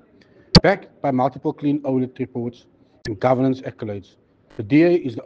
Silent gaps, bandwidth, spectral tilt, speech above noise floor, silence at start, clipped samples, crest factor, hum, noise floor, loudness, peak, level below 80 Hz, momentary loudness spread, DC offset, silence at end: none; 9.4 kHz; -6.5 dB/octave; 32 dB; 0.55 s; under 0.1%; 20 dB; none; -52 dBFS; -20 LUFS; 0 dBFS; -40 dBFS; 17 LU; under 0.1%; 0.05 s